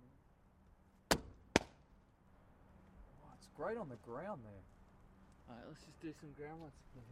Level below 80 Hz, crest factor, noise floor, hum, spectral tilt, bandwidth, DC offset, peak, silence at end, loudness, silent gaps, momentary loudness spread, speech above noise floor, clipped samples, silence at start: -64 dBFS; 36 dB; -68 dBFS; none; -3.5 dB/octave; 14 kHz; under 0.1%; -12 dBFS; 0 s; -43 LUFS; none; 27 LU; 18 dB; under 0.1%; 0 s